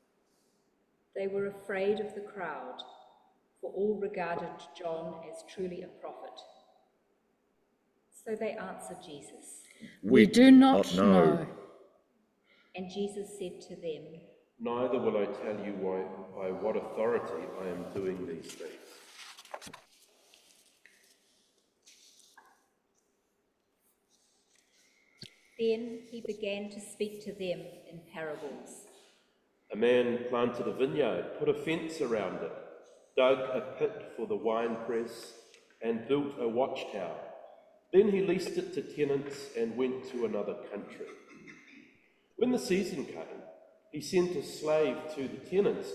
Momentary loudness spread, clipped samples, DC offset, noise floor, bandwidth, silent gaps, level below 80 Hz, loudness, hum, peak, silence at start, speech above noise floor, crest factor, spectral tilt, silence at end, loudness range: 21 LU; under 0.1%; under 0.1%; -77 dBFS; 13.5 kHz; none; -70 dBFS; -31 LUFS; none; -8 dBFS; 1.15 s; 46 dB; 26 dB; -6 dB/octave; 0 s; 18 LU